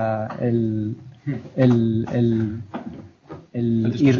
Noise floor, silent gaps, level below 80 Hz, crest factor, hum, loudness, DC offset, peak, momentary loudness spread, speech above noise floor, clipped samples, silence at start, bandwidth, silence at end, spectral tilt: -42 dBFS; none; -54 dBFS; 16 dB; none; -22 LUFS; under 0.1%; -6 dBFS; 17 LU; 21 dB; under 0.1%; 0 s; 7 kHz; 0 s; -9 dB/octave